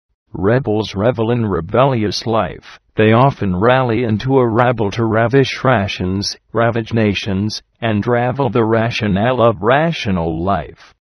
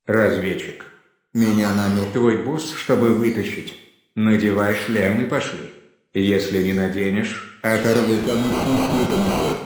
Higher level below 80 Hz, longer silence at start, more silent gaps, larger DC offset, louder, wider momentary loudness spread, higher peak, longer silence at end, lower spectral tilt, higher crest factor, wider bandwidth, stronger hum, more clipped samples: first, -42 dBFS vs -48 dBFS; first, 0.35 s vs 0.05 s; neither; neither; first, -16 LUFS vs -20 LUFS; second, 7 LU vs 11 LU; first, 0 dBFS vs -4 dBFS; first, 0.35 s vs 0 s; about the same, -6.5 dB/octave vs -6 dB/octave; about the same, 16 dB vs 16 dB; second, 11 kHz vs over 20 kHz; neither; neither